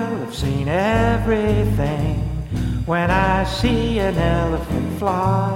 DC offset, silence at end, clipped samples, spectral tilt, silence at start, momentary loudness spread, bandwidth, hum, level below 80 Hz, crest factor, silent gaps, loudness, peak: under 0.1%; 0 s; under 0.1%; -7 dB/octave; 0 s; 7 LU; 16.5 kHz; none; -28 dBFS; 14 dB; none; -20 LUFS; -4 dBFS